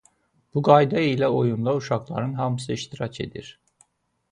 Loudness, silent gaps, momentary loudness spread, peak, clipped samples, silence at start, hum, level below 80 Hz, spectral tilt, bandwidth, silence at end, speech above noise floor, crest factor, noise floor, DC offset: -23 LUFS; none; 15 LU; -2 dBFS; under 0.1%; 0.55 s; none; -58 dBFS; -7 dB/octave; 10.5 kHz; 0.8 s; 45 dB; 22 dB; -67 dBFS; under 0.1%